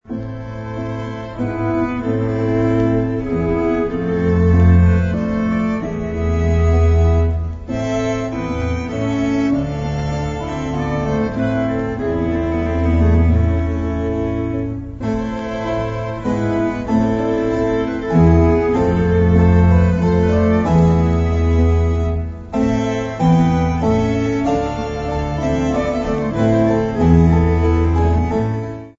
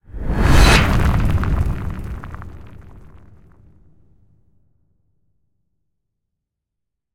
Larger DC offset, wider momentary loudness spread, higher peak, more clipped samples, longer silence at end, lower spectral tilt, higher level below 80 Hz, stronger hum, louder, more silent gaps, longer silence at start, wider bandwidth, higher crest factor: neither; second, 10 LU vs 23 LU; about the same, -2 dBFS vs -2 dBFS; neither; second, 0.05 s vs 4.45 s; first, -8.5 dB/octave vs -5 dB/octave; about the same, -24 dBFS vs -22 dBFS; neither; about the same, -17 LUFS vs -17 LUFS; neither; about the same, 0.1 s vs 0.15 s; second, 7.4 kHz vs 16.5 kHz; about the same, 14 dB vs 18 dB